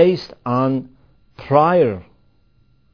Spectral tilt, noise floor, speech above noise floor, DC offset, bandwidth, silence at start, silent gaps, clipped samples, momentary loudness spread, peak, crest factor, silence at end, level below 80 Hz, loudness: -9 dB/octave; -58 dBFS; 41 dB; 0.1%; 5.4 kHz; 0 s; none; under 0.1%; 14 LU; 0 dBFS; 18 dB; 0.9 s; -54 dBFS; -18 LUFS